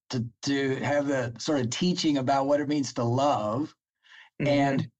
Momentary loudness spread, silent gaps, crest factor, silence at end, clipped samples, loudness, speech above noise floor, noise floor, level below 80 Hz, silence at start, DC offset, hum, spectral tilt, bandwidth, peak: 6 LU; none; 12 dB; 0.1 s; under 0.1%; -27 LUFS; 29 dB; -55 dBFS; -64 dBFS; 0.1 s; under 0.1%; none; -5.5 dB/octave; 8.6 kHz; -14 dBFS